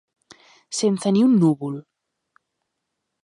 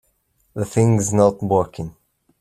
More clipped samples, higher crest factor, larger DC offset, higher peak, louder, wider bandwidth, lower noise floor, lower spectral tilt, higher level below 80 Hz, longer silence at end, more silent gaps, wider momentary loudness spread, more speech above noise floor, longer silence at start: neither; about the same, 16 dB vs 18 dB; neither; second, -8 dBFS vs -2 dBFS; about the same, -20 LUFS vs -19 LUFS; second, 11 kHz vs 14.5 kHz; first, -79 dBFS vs -65 dBFS; about the same, -6.5 dB/octave vs -7 dB/octave; second, -72 dBFS vs -52 dBFS; first, 1.4 s vs 0.5 s; neither; about the same, 15 LU vs 17 LU; first, 61 dB vs 47 dB; first, 0.7 s vs 0.55 s